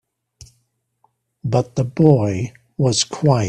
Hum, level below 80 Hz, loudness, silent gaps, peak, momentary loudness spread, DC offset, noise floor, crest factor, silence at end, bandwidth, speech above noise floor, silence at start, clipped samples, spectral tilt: none; -54 dBFS; -18 LUFS; none; 0 dBFS; 12 LU; under 0.1%; -68 dBFS; 18 dB; 0 s; 10.5 kHz; 51 dB; 1.45 s; under 0.1%; -6 dB/octave